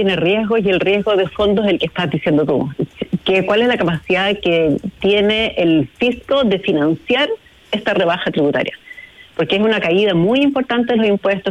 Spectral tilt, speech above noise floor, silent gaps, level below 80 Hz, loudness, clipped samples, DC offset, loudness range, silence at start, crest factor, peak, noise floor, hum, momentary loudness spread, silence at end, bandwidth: -7 dB/octave; 23 dB; none; -46 dBFS; -16 LUFS; under 0.1%; under 0.1%; 2 LU; 0 s; 10 dB; -4 dBFS; -38 dBFS; none; 7 LU; 0 s; 11 kHz